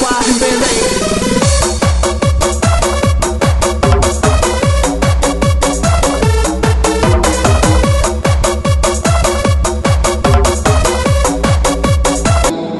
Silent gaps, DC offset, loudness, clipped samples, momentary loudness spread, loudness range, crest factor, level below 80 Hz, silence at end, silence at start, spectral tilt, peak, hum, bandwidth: none; under 0.1%; -12 LUFS; under 0.1%; 2 LU; 0 LU; 12 dB; -16 dBFS; 0 s; 0 s; -4.5 dB/octave; 0 dBFS; none; 12 kHz